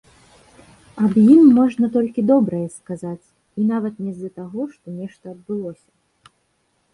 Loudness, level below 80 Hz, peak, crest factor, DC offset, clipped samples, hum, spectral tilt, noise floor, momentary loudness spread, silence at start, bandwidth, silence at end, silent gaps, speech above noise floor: -18 LUFS; -60 dBFS; -2 dBFS; 18 dB; under 0.1%; under 0.1%; none; -9 dB/octave; -66 dBFS; 22 LU; 0.95 s; 11 kHz; 1.2 s; none; 49 dB